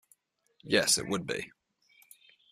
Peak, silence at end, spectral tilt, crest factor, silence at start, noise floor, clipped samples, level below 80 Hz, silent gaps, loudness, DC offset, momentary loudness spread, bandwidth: -12 dBFS; 1.05 s; -2 dB/octave; 22 dB; 0.65 s; -70 dBFS; under 0.1%; -68 dBFS; none; -29 LUFS; under 0.1%; 13 LU; 15 kHz